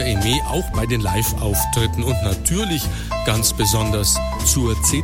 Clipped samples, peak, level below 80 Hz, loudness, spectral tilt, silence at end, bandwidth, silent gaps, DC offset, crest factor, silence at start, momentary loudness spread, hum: under 0.1%; -4 dBFS; -26 dBFS; -19 LUFS; -4 dB/octave; 0 s; 17 kHz; none; under 0.1%; 14 dB; 0 s; 5 LU; none